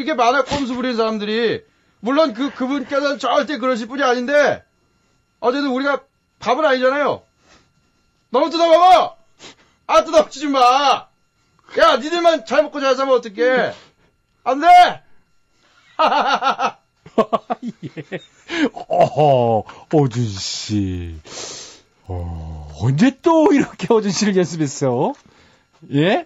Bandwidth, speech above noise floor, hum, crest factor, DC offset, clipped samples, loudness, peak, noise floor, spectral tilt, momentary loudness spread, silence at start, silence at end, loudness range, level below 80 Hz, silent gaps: 10.5 kHz; 45 dB; none; 14 dB; under 0.1%; under 0.1%; -17 LUFS; -4 dBFS; -62 dBFS; -5 dB/octave; 16 LU; 0 s; 0 s; 5 LU; -48 dBFS; none